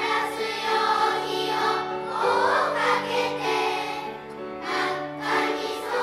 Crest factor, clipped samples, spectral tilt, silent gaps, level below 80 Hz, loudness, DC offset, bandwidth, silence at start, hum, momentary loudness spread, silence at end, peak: 16 dB; under 0.1%; -3 dB/octave; none; -64 dBFS; -25 LUFS; under 0.1%; 16 kHz; 0 s; none; 8 LU; 0 s; -8 dBFS